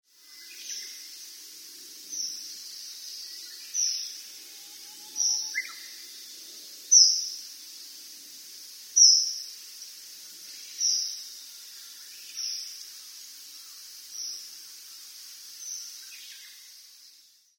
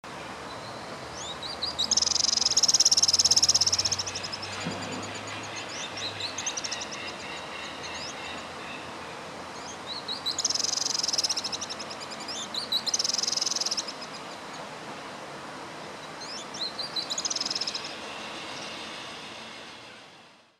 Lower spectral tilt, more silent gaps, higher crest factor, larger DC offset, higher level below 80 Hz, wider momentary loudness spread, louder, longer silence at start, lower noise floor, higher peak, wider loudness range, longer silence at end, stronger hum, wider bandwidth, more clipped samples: second, 6 dB/octave vs 0 dB/octave; neither; about the same, 26 dB vs 24 dB; neither; second, under -90 dBFS vs -64 dBFS; first, 22 LU vs 19 LU; first, -24 LUFS vs -27 LUFS; first, 0.3 s vs 0.05 s; first, -58 dBFS vs -54 dBFS; about the same, -6 dBFS vs -8 dBFS; first, 17 LU vs 13 LU; first, 0.5 s vs 0.25 s; neither; first, 18 kHz vs 16 kHz; neither